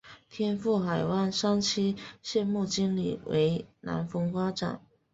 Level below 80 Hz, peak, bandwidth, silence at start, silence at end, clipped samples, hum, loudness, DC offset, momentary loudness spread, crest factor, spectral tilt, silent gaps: -62 dBFS; -16 dBFS; 8 kHz; 0.05 s; 0.35 s; under 0.1%; none; -30 LUFS; under 0.1%; 9 LU; 14 dB; -5.5 dB/octave; none